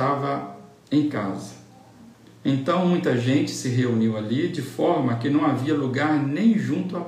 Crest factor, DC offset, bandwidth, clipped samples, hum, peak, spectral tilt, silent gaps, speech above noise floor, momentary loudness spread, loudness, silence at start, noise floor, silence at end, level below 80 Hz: 14 dB; under 0.1%; 14.5 kHz; under 0.1%; none; -8 dBFS; -6.5 dB/octave; none; 26 dB; 8 LU; -23 LUFS; 0 s; -48 dBFS; 0 s; -70 dBFS